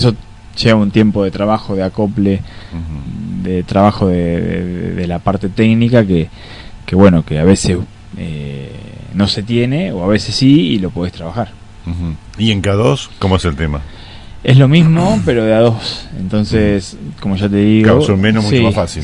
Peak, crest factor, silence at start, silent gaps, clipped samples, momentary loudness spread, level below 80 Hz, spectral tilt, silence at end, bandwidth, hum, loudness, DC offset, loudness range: 0 dBFS; 12 dB; 0 s; none; 0.3%; 16 LU; -34 dBFS; -6.5 dB/octave; 0 s; 11 kHz; none; -13 LUFS; under 0.1%; 4 LU